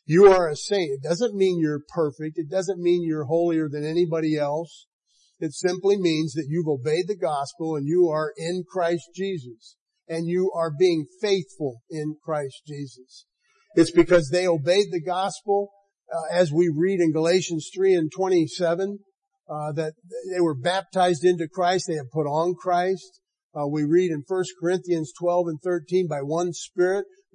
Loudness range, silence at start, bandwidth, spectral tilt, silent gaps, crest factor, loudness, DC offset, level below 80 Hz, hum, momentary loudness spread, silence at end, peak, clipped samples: 4 LU; 0.1 s; 10.5 kHz; -6 dB/octave; 4.87-5.01 s, 9.81-9.86 s, 19.17-19.22 s, 23.43-23.50 s; 18 dB; -24 LUFS; under 0.1%; -56 dBFS; none; 11 LU; 0.3 s; -4 dBFS; under 0.1%